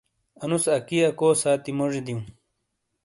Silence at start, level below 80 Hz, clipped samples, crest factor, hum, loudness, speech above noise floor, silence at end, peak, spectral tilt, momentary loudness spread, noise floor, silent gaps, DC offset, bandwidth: 0.4 s; -64 dBFS; under 0.1%; 16 dB; none; -23 LUFS; 54 dB; 0.75 s; -8 dBFS; -4.5 dB/octave; 14 LU; -77 dBFS; none; under 0.1%; 11.5 kHz